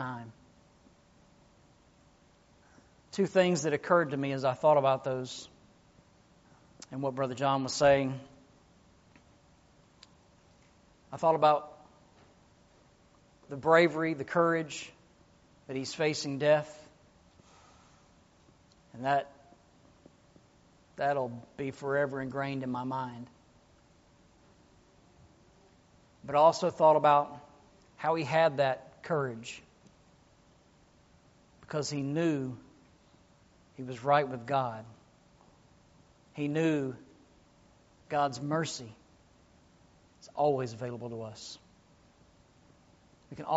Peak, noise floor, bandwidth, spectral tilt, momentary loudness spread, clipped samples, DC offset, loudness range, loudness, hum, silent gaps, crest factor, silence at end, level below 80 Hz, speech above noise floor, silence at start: -10 dBFS; -63 dBFS; 8 kHz; -4.5 dB/octave; 21 LU; under 0.1%; under 0.1%; 10 LU; -30 LUFS; none; none; 24 dB; 0 s; -68 dBFS; 34 dB; 0 s